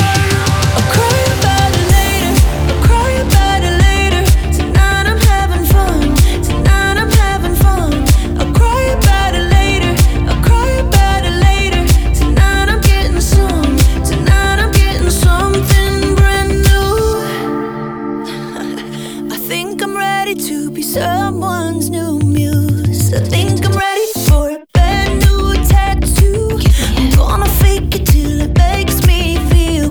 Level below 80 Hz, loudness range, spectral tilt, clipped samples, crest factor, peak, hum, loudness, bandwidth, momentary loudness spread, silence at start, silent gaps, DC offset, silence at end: -14 dBFS; 5 LU; -5 dB/octave; under 0.1%; 10 dB; 0 dBFS; none; -12 LUFS; over 20 kHz; 6 LU; 0 s; none; under 0.1%; 0 s